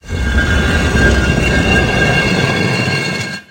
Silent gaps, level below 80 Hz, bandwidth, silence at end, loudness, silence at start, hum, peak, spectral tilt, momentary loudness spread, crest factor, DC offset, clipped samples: none; -20 dBFS; 16 kHz; 0.1 s; -13 LUFS; 0.05 s; none; 0 dBFS; -5 dB/octave; 5 LU; 14 dB; under 0.1%; under 0.1%